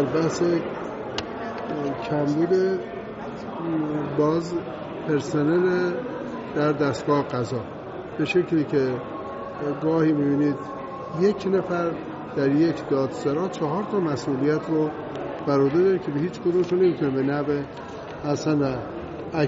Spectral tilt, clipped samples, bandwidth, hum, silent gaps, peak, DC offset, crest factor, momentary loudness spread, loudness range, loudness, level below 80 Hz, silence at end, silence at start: -6.5 dB/octave; under 0.1%; 8 kHz; none; none; -8 dBFS; under 0.1%; 16 dB; 12 LU; 2 LU; -25 LUFS; -56 dBFS; 0 s; 0 s